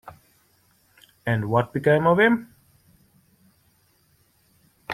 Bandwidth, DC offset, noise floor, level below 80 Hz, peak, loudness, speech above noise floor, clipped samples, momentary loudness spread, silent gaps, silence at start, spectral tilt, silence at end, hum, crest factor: 16 kHz; under 0.1%; -63 dBFS; -60 dBFS; -6 dBFS; -21 LUFS; 43 dB; under 0.1%; 13 LU; none; 0.05 s; -7.5 dB/octave; 0 s; none; 20 dB